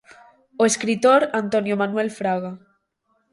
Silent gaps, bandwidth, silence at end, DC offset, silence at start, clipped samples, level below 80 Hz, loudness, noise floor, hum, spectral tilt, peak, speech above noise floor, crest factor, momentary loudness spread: none; 11.5 kHz; 0.75 s; under 0.1%; 0.6 s; under 0.1%; -68 dBFS; -20 LUFS; -69 dBFS; none; -4 dB/octave; -6 dBFS; 49 dB; 16 dB; 8 LU